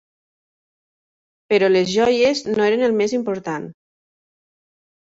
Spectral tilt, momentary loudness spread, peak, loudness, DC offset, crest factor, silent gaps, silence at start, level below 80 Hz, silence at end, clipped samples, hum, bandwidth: -4.5 dB/octave; 11 LU; -6 dBFS; -18 LUFS; under 0.1%; 16 dB; none; 1.5 s; -60 dBFS; 1.4 s; under 0.1%; none; 8 kHz